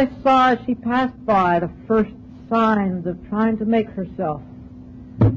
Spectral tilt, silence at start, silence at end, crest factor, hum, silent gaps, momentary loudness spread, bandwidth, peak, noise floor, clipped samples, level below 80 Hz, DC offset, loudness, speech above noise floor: -8.5 dB/octave; 0 s; 0 s; 12 dB; none; none; 18 LU; 7.2 kHz; -8 dBFS; -39 dBFS; under 0.1%; -44 dBFS; under 0.1%; -20 LUFS; 19 dB